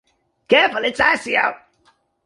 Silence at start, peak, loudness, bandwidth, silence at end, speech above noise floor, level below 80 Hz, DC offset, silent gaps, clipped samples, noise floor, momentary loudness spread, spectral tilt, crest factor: 0.5 s; -2 dBFS; -17 LUFS; 11.5 kHz; 0.7 s; 43 dB; -56 dBFS; under 0.1%; none; under 0.1%; -61 dBFS; 4 LU; -3 dB/octave; 18 dB